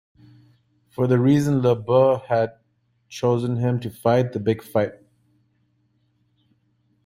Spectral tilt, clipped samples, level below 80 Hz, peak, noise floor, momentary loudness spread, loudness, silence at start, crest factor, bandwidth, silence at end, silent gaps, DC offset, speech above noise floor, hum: -8 dB/octave; under 0.1%; -60 dBFS; -4 dBFS; -67 dBFS; 8 LU; -21 LUFS; 1 s; 18 dB; 15.5 kHz; 2.15 s; none; under 0.1%; 47 dB; none